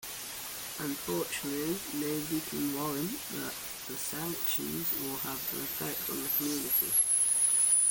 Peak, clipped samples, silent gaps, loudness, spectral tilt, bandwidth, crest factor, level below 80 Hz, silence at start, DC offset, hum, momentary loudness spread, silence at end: -18 dBFS; under 0.1%; none; -30 LUFS; -2 dB/octave; 17 kHz; 14 dB; -64 dBFS; 0 s; under 0.1%; none; 13 LU; 0 s